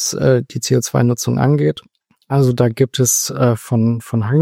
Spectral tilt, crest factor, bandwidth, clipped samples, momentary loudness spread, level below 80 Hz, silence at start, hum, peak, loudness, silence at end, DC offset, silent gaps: -5.5 dB/octave; 14 dB; 16.5 kHz; under 0.1%; 4 LU; -50 dBFS; 0 s; none; -2 dBFS; -16 LUFS; 0 s; under 0.1%; none